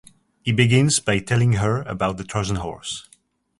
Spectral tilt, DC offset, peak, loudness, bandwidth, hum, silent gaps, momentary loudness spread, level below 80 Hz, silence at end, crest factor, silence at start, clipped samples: -5 dB/octave; under 0.1%; -2 dBFS; -21 LUFS; 11.5 kHz; none; none; 13 LU; -44 dBFS; 0.6 s; 18 dB; 0.45 s; under 0.1%